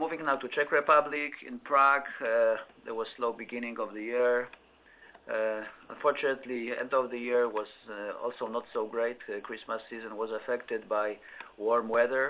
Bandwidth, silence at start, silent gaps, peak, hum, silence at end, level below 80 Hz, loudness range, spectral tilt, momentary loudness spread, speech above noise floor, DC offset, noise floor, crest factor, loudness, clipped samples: 4 kHz; 0 s; none; -10 dBFS; none; 0 s; -76 dBFS; 7 LU; -7.5 dB/octave; 14 LU; 27 dB; under 0.1%; -58 dBFS; 20 dB; -31 LUFS; under 0.1%